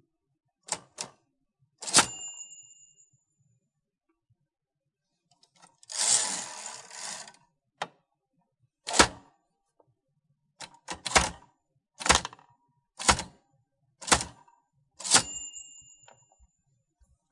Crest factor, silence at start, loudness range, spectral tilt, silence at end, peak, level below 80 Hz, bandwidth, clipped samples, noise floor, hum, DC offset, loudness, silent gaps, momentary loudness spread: 28 dB; 0.7 s; 3 LU; -1 dB/octave; 1.5 s; -4 dBFS; -52 dBFS; 11.5 kHz; under 0.1%; -86 dBFS; none; under 0.1%; -26 LUFS; none; 22 LU